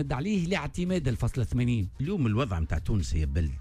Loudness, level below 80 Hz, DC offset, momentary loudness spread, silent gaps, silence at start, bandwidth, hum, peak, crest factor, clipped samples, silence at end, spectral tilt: -29 LUFS; -36 dBFS; under 0.1%; 3 LU; none; 0 s; 13 kHz; none; -16 dBFS; 12 dB; under 0.1%; 0 s; -7 dB/octave